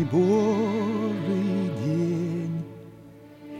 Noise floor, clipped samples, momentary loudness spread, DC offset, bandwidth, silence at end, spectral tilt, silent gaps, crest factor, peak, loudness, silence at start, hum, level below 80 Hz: -47 dBFS; under 0.1%; 14 LU; under 0.1%; 11.5 kHz; 0 s; -8 dB/octave; none; 14 dB; -12 dBFS; -25 LUFS; 0 s; none; -60 dBFS